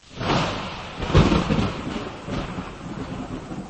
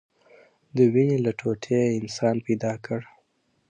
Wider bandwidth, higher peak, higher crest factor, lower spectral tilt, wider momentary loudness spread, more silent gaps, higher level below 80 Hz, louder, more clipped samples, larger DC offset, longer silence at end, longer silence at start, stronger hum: about the same, 8.8 kHz vs 9.4 kHz; first, -4 dBFS vs -8 dBFS; about the same, 20 dB vs 18 dB; about the same, -6 dB/octave vs -7 dB/octave; about the same, 14 LU vs 12 LU; neither; first, -34 dBFS vs -66 dBFS; about the same, -25 LUFS vs -24 LUFS; neither; neither; second, 0 s vs 0.65 s; second, 0.05 s vs 0.75 s; neither